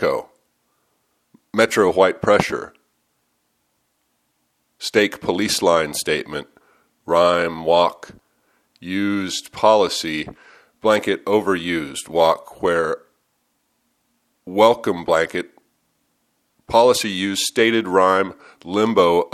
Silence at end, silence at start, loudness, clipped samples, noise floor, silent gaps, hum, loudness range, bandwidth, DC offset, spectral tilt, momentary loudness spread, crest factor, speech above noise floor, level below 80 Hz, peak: 0.05 s; 0 s; -19 LUFS; under 0.1%; -69 dBFS; none; none; 3 LU; 15.5 kHz; under 0.1%; -4 dB/octave; 12 LU; 20 dB; 51 dB; -56 dBFS; 0 dBFS